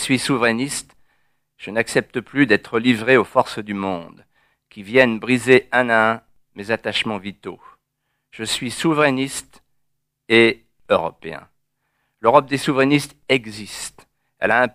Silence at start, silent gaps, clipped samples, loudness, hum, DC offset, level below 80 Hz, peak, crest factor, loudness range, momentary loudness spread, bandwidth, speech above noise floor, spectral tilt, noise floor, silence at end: 0 s; none; under 0.1%; -19 LUFS; none; under 0.1%; -56 dBFS; 0 dBFS; 20 dB; 4 LU; 17 LU; 15.5 kHz; 55 dB; -4.5 dB/octave; -74 dBFS; 0.05 s